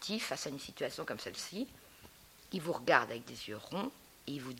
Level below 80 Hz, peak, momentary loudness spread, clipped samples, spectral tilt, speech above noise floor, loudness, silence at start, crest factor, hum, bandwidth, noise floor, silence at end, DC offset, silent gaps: -70 dBFS; -12 dBFS; 25 LU; under 0.1%; -3.5 dB/octave; 21 dB; -38 LUFS; 0 s; 28 dB; none; 16.5 kHz; -59 dBFS; 0 s; under 0.1%; none